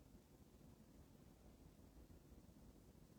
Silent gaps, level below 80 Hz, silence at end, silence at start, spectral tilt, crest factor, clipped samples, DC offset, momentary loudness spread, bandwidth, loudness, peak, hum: none; -70 dBFS; 0 s; 0 s; -6 dB/octave; 14 dB; under 0.1%; under 0.1%; 2 LU; over 20 kHz; -67 LUFS; -52 dBFS; none